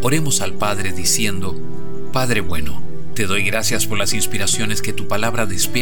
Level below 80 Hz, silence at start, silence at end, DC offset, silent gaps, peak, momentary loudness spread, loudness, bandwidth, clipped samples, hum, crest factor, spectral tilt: -40 dBFS; 0 s; 0 s; 20%; none; -4 dBFS; 12 LU; -20 LUFS; over 20 kHz; under 0.1%; none; 18 dB; -3 dB/octave